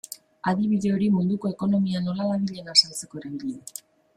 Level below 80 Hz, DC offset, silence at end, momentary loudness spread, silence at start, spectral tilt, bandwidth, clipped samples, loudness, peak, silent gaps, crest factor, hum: -64 dBFS; under 0.1%; 0.4 s; 17 LU; 0.1 s; -5 dB/octave; 15 kHz; under 0.1%; -24 LUFS; -4 dBFS; none; 22 dB; none